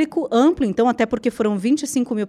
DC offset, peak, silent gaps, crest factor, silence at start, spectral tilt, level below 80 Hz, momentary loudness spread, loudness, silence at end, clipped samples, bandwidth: under 0.1%; -6 dBFS; none; 14 dB; 0 s; -5.5 dB/octave; -50 dBFS; 4 LU; -19 LUFS; 0 s; under 0.1%; 13.5 kHz